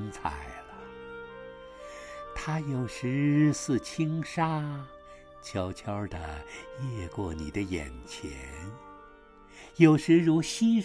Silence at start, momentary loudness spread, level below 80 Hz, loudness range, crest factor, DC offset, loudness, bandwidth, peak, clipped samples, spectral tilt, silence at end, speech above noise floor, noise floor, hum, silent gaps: 0 s; 23 LU; -50 dBFS; 10 LU; 24 dB; under 0.1%; -29 LUFS; 11 kHz; -6 dBFS; under 0.1%; -6 dB/octave; 0 s; 25 dB; -53 dBFS; none; none